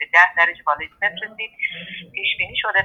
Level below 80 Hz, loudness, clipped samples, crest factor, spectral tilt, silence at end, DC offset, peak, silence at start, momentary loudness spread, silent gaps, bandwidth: -58 dBFS; -19 LUFS; under 0.1%; 20 dB; -2.5 dB/octave; 0 s; under 0.1%; 0 dBFS; 0 s; 15 LU; none; 7.4 kHz